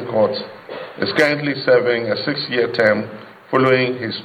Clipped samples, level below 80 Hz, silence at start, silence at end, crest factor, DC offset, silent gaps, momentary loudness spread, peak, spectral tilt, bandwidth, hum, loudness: under 0.1%; -62 dBFS; 0 s; 0 s; 16 dB; under 0.1%; none; 17 LU; -2 dBFS; -6 dB/octave; 11 kHz; none; -18 LUFS